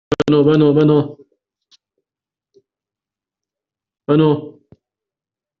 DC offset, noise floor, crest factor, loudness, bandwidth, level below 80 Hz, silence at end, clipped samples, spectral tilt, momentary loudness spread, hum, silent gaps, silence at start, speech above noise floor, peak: under 0.1%; -89 dBFS; 16 dB; -14 LUFS; 7.2 kHz; -54 dBFS; 1.1 s; under 0.1%; -7.5 dB/octave; 12 LU; none; none; 0.1 s; 77 dB; -2 dBFS